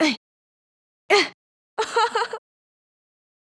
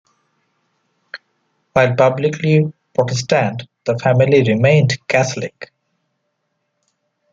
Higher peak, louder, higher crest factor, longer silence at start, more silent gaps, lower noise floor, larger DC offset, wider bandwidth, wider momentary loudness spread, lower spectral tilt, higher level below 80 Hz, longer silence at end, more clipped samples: second, -4 dBFS vs 0 dBFS; second, -22 LUFS vs -16 LUFS; about the same, 22 dB vs 18 dB; second, 0 s vs 1.15 s; first, 0.17-1.09 s, 1.34-1.77 s vs none; first, under -90 dBFS vs -71 dBFS; neither; first, 11 kHz vs 7.8 kHz; second, 15 LU vs 23 LU; second, -1.5 dB/octave vs -6 dB/octave; second, -80 dBFS vs -56 dBFS; second, 1.05 s vs 1.7 s; neither